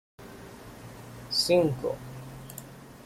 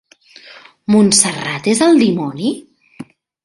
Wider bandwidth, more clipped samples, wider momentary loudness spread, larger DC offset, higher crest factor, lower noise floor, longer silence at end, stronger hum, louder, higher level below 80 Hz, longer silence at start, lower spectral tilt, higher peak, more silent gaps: first, 16.5 kHz vs 11.5 kHz; neither; first, 23 LU vs 11 LU; neither; about the same, 20 dB vs 16 dB; about the same, -46 dBFS vs -43 dBFS; second, 0.05 s vs 0.4 s; neither; second, -27 LUFS vs -13 LUFS; about the same, -56 dBFS vs -56 dBFS; second, 0.2 s vs 0.9 s; about the same, -4.5 dB/octave vs -3.5 dB/octave; second, -12 dBFS vs 0 dBFS; neither